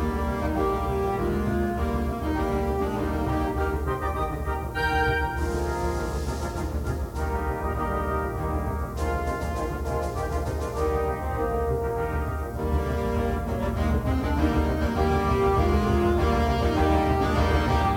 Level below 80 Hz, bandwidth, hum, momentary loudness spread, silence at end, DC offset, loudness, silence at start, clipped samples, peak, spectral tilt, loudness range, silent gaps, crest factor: -30 dBFS; 17 kHz; none; 7 LU; 0 s; under 0.1%; -26 LUFS; 0 s; under 0.1%; -10 dBFS; -7 dB/octave; 5 LU; none; 16 dB